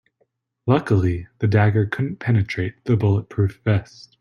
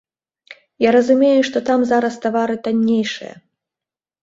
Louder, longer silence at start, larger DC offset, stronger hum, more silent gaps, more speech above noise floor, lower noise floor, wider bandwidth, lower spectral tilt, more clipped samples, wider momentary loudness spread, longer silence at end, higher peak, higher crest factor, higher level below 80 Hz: second, -21 LUFS vs -16 LUFS; first, 0.65 s vs 0.5 s; neither; neither; neither; second, 49 dB vs 73 dB; second, -68 dBFS vs -89 dBFS; second, 6.6 kHz vs 7.8 kHz; first, -8.5 dB/octave vs -5.5 dB/octave; neither; about the same, 7 LU vs 8 LU; second, 0.4 s vs 0.9 s; about the same, -2 dBFS vs -2 dBFS; about the same, 18 dB vs 16 dB; first, -50 dBFS vs -62 dBFS